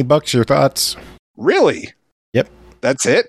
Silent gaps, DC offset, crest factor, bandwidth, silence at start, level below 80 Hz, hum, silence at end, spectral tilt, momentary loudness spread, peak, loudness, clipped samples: 1.19-1.34 s, 2.12-2.33 s; under 0.1%; 16 dB; 15.5 kHz; 0 s; -50 dBFS; none; 0.05 s; -4 dB/octave; 14 LU; -2 dBFS; -16 LUFS; under 0.1%